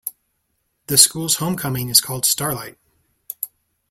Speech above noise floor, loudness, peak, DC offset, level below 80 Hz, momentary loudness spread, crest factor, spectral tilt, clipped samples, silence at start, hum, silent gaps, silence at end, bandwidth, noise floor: 52 dB; -16 LUFS; 0 dBFS; under 0.1%; -56 dBFS; 19 LU; 22 dB; -2 dB/octave; under 0.1%; 0.05 s; none; none; 0.45 s; 16.5 kHz; -71 dBFS